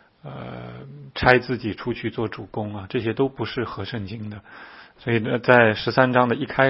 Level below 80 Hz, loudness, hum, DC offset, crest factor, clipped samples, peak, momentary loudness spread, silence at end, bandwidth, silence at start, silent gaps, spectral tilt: -50 dBFS; -22 LUFS; none; under 0.1%; 22 dB; under 0.1%; 0 dBFS; 20 LU; 0 s; 5.8 kHz; 0.25 s; none; -8.5 dB/octave